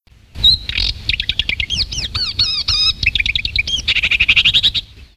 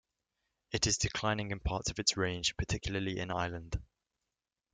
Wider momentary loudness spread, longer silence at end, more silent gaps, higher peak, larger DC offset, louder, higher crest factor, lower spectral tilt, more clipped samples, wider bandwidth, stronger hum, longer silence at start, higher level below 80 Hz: about the same, 8 LU vs 9 LU; second, 0.15 s vs 0.9 s; neither; first, 0 dBFS vs -10 dBFS; neither; first, -14 LUFS vs -34 LUFS; second, 16 dB vs 26 dB; second, -1 dB/octave vs -3 dB/octave; neither; first, 15.5 kHz vs 9.6 kHz; neither; second, 0.35 s vs 0.7 s; first, -30 dBFS vs -48 dBFS